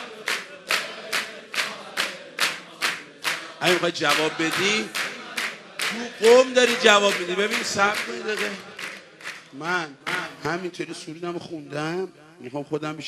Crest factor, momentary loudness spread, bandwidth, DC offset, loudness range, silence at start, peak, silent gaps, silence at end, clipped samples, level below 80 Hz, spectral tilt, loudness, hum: 24 dB; 17 LU; 14 kHz; under 0.1%; 10 LU; 0 s; 0 dBFS; none; 0 s; under 0.1%; -72 dBFS; -2.5 dB/octave; -23 LUFS; none